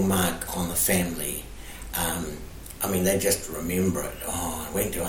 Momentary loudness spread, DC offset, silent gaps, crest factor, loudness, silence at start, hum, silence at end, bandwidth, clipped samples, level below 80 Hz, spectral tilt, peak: 13 LU; under 0.1%; none; 20 dB; -26 LUFS; 0 s; none; 0 s; 17 kHz; under 0.1%; -42 dBFS; -4 dB/octave; -6 dBFS